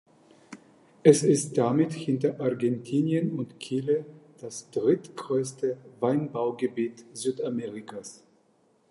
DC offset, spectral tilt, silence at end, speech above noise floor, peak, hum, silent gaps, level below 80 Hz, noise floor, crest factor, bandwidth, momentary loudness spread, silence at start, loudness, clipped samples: under 0.1%; -6 dB/octave; 0.75 s; 39 dB; -4 dBFS; none; none; -76 dBFS; -65 dBFS; 24 dB; 11.5 kHz; 16 LU; 0.5 s; -27 LUFS; under 0.1%